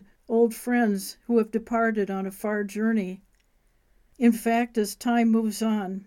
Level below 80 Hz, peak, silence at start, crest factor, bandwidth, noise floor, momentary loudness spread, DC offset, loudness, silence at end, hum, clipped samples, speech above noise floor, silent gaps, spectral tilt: -62 dBFS; -10 dBFS; 0.3 s; 16 dB; 17 kHz; -65 dBFS; 7 LU; under 0.1%; -25 LUFS; 0 s; none; under 0.1%; 40 dB; none; -5.5 dB/octave